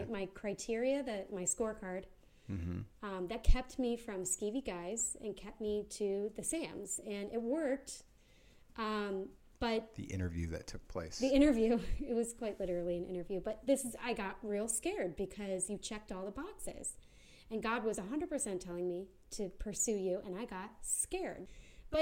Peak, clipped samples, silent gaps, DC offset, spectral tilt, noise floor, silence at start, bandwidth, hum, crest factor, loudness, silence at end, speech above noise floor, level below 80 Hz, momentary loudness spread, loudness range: -14 dBFS; under 0.1%; none; under 0.1%; -4 dB/octave; -63 dBFS; 0 s; 16.5 kHz; none; 24 dB; -38 LUFS; 0 s; 26 dB; -46 dBFS; 10 LU; 5 LU